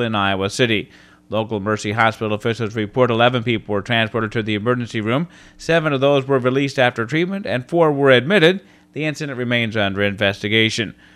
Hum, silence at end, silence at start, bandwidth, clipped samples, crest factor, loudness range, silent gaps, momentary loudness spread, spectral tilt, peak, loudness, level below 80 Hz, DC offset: none; 0.25 s; 0 s; 13.5 kHz; under 0.1%; 18 dB; 3 LU; none; 9 LU; -5.5 dB/octave; 0 dBFS; -18 LUFS; -54 dBFS; under 0.1%